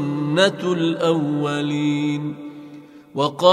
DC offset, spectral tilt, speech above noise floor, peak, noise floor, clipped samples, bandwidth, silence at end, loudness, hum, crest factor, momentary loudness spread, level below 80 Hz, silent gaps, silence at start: under 0.1%; -6 dB/octave; 22 dB; 0 dBFS; -41 dBFS; under 0.1%; 11.5 kHz; 0 s; -21 LUFS; none; 20 dB; 17 LU; -68 dBFS; none; 0 s